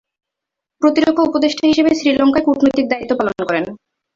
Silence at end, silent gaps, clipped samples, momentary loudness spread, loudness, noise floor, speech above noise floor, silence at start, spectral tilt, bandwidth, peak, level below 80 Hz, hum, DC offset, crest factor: 0.4 s; none; under 0.1%; 6 LU; -15 LUFS; -82 dBFS; 68 dB; 0.8 s; -5 dB/octave; 7.6 kHz; -2 dBFS; -52 dBFS; none; under 0.1%; 14 dB